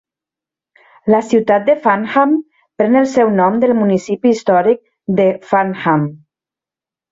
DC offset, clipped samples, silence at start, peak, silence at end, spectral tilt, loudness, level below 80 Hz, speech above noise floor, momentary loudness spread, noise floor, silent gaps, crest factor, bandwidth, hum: under 0.1%; under 0.1%; 1.05 s; 0 dBFS; 0.95 s; -7 dB/octave; -14 LUFS; -58 dBFS; 76 dB; 6 LU; -89 dBFS; none; 14 dB; 7.8 kHz; none